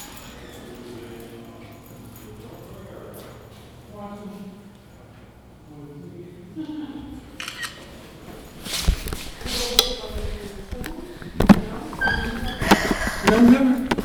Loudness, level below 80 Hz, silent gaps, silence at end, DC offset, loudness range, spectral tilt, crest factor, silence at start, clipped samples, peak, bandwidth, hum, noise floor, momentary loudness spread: -21 LUFS; -36 dBFS; none; 0 s; under 0.1%; 20 LU; -4.5 dB/octave; 24 dB; 0 s; under 0.1%; 0 dBFS; over 20 kHz; none; -46 dBFS; 25 LU